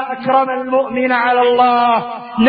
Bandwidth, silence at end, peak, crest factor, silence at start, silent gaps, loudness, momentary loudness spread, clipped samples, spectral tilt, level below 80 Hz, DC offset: 5 kHz; 0 s; 0 dBFS; 14 dB; 0 s; none; -14 LUFS; 5 LU; under 0.1%; -10 dB/octave; -56 dBFS; under 0.1%